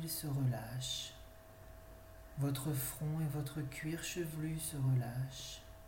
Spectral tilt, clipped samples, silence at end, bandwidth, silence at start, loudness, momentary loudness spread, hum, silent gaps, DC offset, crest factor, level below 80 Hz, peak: -5 dB/octave; under 0.1%; 0 s; 17 kHz; 0 s; -40 LUFS; 20 LU; none; none; under 0.1%; 14 dB; -58 dBFS; -26 dBFS